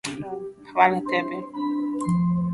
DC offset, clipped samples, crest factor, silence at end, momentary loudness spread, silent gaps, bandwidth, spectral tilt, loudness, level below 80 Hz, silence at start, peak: under 0.1%; under 0.1%; 22 dB; 0 s; 13 LU; none; 11.5 kHz; -6.5 dB/octave; -24 LUFS; -56 dBFS; 0.05 s; -4 dBFS